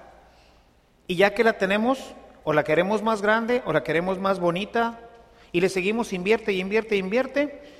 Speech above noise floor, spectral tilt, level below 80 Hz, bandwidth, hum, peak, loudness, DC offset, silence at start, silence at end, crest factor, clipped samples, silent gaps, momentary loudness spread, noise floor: 36 dB; -5.5 dB/octave; -56 dBFS; 15 kHz; none; -6 dBFS; -24 LUFS; under 0.1%; 1.1 s; 0.1 s; 20 dB; under 0.1%; none; 7 LU; -59 dBFS